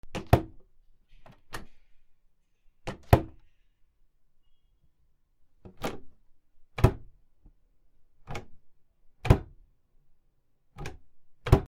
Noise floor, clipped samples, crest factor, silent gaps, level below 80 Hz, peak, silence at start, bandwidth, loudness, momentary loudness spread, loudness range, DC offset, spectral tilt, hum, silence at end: -66 dBFS; under 0.1%; 30 dB; none; -40 dBFS; -4 dBFS; 0.05 s; 16 kHz; -28 LUFS; 19 LU; 3 LU; under 0.1%; -7.5 dB/octave; none; 0 s